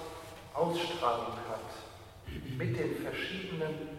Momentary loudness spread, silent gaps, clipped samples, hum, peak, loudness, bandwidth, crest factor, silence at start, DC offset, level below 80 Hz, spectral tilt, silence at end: 14 LU; none; under 0.1%; none; -18 dBFS; -36 LUFS; 16 kHz; 20 dB; 0 s; under 0.1%; -58 dBFS; -5.5 dB/octave; 0 s